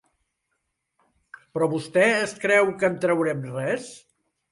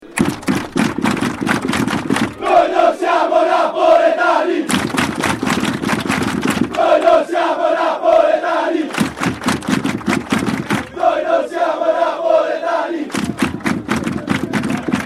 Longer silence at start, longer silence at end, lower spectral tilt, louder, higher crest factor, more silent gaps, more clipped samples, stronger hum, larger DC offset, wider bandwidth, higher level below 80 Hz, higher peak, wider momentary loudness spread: first, 1.55 s vs 0 s; first, 0.55 s vs 0 s; about the same, -5 dB/octave vs -5 dB/octave; second, -23 LUFS vs -16 LUFS; first, 20 dB vs 14 dB; neither; neither; neither; neither; second, 11.5 kHz vs 15 kHz; second, -68 dBFS vs -46 dBFS; second, -6 dBFS vs -2 dBFS; first, 10 LU vs 7 LU